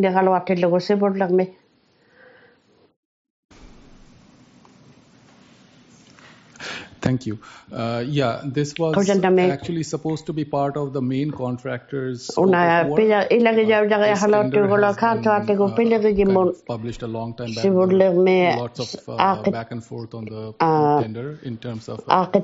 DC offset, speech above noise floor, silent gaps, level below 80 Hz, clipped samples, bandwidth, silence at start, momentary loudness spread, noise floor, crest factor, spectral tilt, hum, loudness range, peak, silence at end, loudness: under 0.1%; 40 dB; 2.96-3.49 s; -54 dBFS; under 0.1%; 8 kHz; 0 s; 15 LU; -59 dBFS; 20 dB; -5.5 dB/octave; none; 11 LU; 0 dBFS; 0 s; -20 LUFS